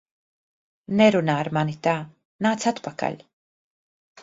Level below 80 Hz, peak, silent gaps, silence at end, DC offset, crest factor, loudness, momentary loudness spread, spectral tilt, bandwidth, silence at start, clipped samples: -66 dBFS; -4 dBFS; 2.25-2.39 s; 1.05 s; under 0.1%; 22 dB; -23 LUFS; 12 LU; -6 dB/octave; 7.8 kHz; 0.9 s; under 0.1%